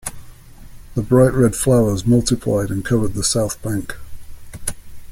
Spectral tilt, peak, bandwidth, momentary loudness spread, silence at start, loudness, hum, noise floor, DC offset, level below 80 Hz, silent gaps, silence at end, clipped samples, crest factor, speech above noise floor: -5.5 dB/octave; -2 dBFS; 16.5 kHz; 14 LU; 0.05 s; -18 LUFS; none; -38 dBFS; under 0.1%; -36 dBFS; none; 0 s; under 0.1%; 18 dB; 22 dB